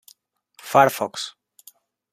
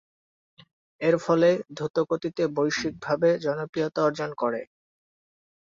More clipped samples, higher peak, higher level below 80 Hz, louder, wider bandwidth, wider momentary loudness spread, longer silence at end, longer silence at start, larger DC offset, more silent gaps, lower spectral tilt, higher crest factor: neither; first, -2 dBFS vs -10 dBFS; about the same, -70 dBFS vs -66 dBFS; first, -20 LUFS vs -26 LUFS; first, 15.5 kHz vs 7.6 kHz; first, 17 LU vs 8 LU; second, 0.8 s vs 1.15 s; second, 0.65 s vs 1 s; neither; second, none vs 1.90-1.94 s, 3.69-3.73 s; second, -4 dB/octave vs -6 dB/octave; about the same, 22 dB vs 18 dB